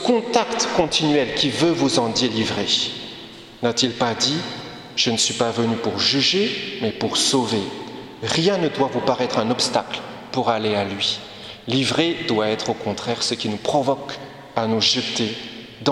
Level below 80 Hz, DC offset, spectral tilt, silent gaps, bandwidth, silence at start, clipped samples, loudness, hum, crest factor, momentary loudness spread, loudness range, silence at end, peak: -56 dBFS; under 0.1%; -3.5 dB/octave; none; 13.5 kHz; 0 s; under 0.1%; -20 LUFS; none; 20 dB; 12 LU; 2 LU; 0 s; -2 dBFS